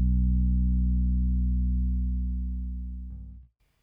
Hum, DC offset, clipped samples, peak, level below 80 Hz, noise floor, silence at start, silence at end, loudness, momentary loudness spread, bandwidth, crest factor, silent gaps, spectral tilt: none; under 0.1%; under 0.1%; -16 dBFS; -26 dBFS; -51 dBFS; 0 s; 0.4 s; -28 LUFS; 15 LU; 0.4 kHz; 10 dB; none; -13 dB/octave